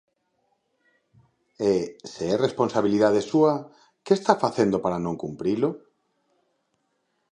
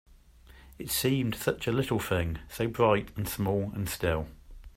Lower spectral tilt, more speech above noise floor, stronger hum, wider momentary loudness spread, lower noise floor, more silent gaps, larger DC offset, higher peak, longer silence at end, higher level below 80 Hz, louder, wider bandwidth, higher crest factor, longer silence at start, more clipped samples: first, -6.5 dB/octave vs -5 dB/octave; first, 50 dB vs 26 dB; neither; about the same, 10 LU vs 9 LU; first, -73 dBFS vs -55 dBFS; neither; neither; first, -2 dBFS vs -10 dBFS; first, 1.55 s vs 0.1 s; second, -62 dBFS vs -48 dBFS; first, -24 LUFS vs -30 LUFS; second, 10 kHz vs 16 kHz; about the same, 24 dB vs 20 dB; first, 1.6 s vs 0.5 s; neither